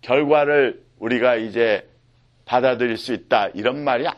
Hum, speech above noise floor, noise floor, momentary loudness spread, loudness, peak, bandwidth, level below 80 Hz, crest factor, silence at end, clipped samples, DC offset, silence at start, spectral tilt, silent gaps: none; 38 dB; -57 dBFS; 8 LU; -20 LUFS; -2 dBFS; 12 kHz; -60 dBFS; 20 dB; 0.05 s; under 0.1%; under 0.1%; 0.05 s; -6 dB/octave; none